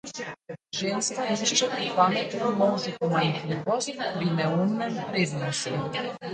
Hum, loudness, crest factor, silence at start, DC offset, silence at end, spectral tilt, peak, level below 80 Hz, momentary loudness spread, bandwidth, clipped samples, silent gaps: none; -26 LUFS; 20 dB; 0.05 s; under 0.1%; 0 s; -4 dB/octave; -8 dBFS; -68 dBFS; 8 LU; 9.4 kHz; under 0.1%; none